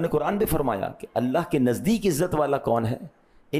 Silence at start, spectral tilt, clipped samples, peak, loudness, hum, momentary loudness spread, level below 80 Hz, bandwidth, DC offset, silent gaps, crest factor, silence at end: 0 s; -6.5 dB/octave; under 0.1%; -12 dBFS; -25 LUFS; none; 7 LU; -44 dBFS; 15.5 kHz; under 0.1%; none; 12 dB; 0 s